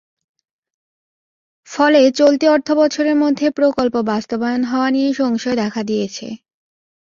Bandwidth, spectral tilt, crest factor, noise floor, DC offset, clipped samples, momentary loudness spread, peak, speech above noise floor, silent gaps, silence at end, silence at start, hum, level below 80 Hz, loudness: 7.4 kHz; -4.5 dB/octave; 16 dB; under -90 dBFS; under 0.1%; under 0.1%; 10 LU; -2 dBFS; over 75 dB; none; 0.65 s; 1.7 s; none; -60 dBFS; -16 LUFS